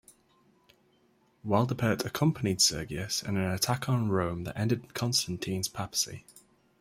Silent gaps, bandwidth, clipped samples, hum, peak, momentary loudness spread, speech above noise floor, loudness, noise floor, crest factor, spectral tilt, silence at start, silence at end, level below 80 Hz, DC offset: none; 16 kHz; under 0.1%; none; -10 dBFS; 8 LU; 38 dB; -29 LUFS; -67 dBFS; 22 dB; -4 dB/octave; 1.45 s; 0.4 s; -60 dBFS; under 0.1%